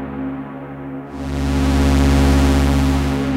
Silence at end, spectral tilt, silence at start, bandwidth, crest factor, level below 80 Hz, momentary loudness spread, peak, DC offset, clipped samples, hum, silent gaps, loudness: 0 s; -6.5 dB/octave; 0 s; 15 kHz; 12 dB; -20 dBFS; 16 LU; -6 dBFS; under 0.1%; under 0.1%; none; none; -17 LUFS